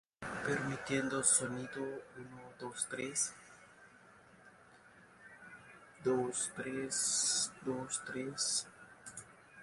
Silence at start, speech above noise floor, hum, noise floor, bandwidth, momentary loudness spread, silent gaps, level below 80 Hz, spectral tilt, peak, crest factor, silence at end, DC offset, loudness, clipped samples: 0.2 s; 24 dB; none; -62 dBFS; 11.5 kHz; 23 LU; none; -74 dBFS; -2 dB/octave; -14 dBFS; 24 dB; 0 s; under 0.1%; -35 LUFS; under 0.1%